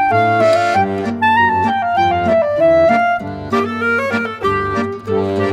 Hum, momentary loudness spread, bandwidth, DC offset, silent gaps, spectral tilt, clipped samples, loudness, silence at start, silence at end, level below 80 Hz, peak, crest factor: none; 7 LU; 11.5 kHz; under 0.1%; none; -6.5 dB/octave; under 0.1%; -15 LUFS; 0 s; 0 s; -46 dBFS; -2 dBFS; 12 dB